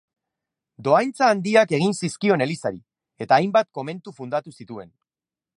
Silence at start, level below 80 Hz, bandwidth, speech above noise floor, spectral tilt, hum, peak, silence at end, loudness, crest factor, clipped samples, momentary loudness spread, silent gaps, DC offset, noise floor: 0.8 s; -68 dBFS; 11.5 kHz; over 69 dB; -5.5 dB/octave; none; -2 dBFS; 0.75 s; -21 LUFS; 20 dB; under 0.1%; 20 LU; none; under 0.1%; under -90 dBFS